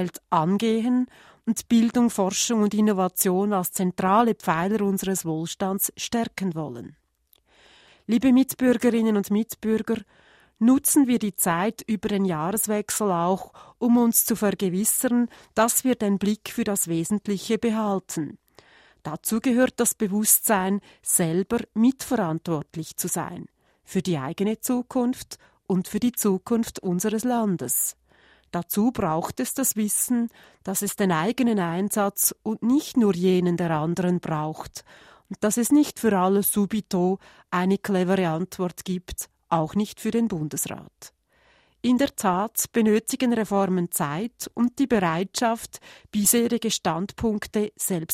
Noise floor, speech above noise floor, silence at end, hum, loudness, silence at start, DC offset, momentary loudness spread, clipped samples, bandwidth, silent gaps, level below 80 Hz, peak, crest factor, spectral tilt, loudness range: -64 dBFS; 41 dB; 0 s; none; -24 LUFS; 0 s; under 0.1%; 10 LU; under 0.1%; 16 kHz; none; -58 dBFS; -2 dBFS; 22 dB; -4.5 dB/octave; 4 LU